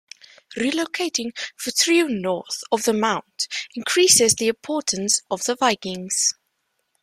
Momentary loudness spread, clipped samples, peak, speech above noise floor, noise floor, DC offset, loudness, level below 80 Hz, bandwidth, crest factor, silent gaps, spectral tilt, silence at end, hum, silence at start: 12 LU; under 0.1%; 0 dBFS; 51 dB; -73 dBFS; under 0.1%; -20 LUFS; -66 dBFS; 15.5 kHz; 22 dB; none; -1.5 dB/octave; 0.7 s; none; 0.5 s